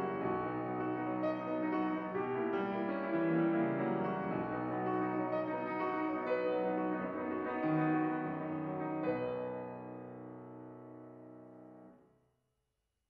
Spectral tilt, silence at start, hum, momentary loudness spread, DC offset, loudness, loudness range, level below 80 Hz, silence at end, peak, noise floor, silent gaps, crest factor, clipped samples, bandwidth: -10 dB/octave; 0 s; none; 18 LU; under 0.1%; -36 LUFS; 9 LU; -74 dBFS; 1.15 s; -22 dBFS; -84 dBFS; none; 14 dB; under 0.1%; 5.2 kHz